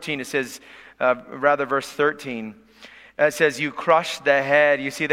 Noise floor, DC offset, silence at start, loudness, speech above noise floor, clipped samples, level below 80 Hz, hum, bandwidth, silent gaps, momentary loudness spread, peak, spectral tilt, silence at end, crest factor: -47 dBFS; under 0.1%; 0 s; -21 LUFS; 25 dB; under 0.1%; -64 dBFS; none; 16 kHz; none; 15 LU; -2 dBFS; -4 dB/octave; 0 s; 20 dB